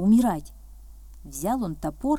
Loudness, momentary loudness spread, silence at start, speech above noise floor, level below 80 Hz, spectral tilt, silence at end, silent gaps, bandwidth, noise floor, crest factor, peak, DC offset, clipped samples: -26 LUFS; 24 LU; 0 s; 21 dB; -44 dBFS; -7 dB/octave; 0 s; none; 16.5 kHz; -44 dBFS; 14 dB; -10 dBFS; under 0.1%; under 0.1%